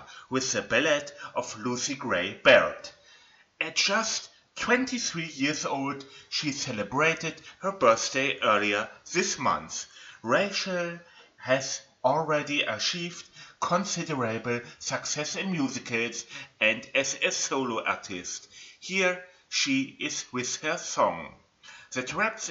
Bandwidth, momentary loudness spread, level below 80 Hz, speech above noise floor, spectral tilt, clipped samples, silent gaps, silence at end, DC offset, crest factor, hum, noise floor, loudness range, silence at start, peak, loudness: 8.2 kHz; 12 LU; -68 dBFS; 30 dB; -2.5 dB/octave; under 0.1%; none; 0 s; under 0.1%; 24 dB; none; -58 dBFS; 4 LU; 0 s; -4 dBFS; -27 LUFS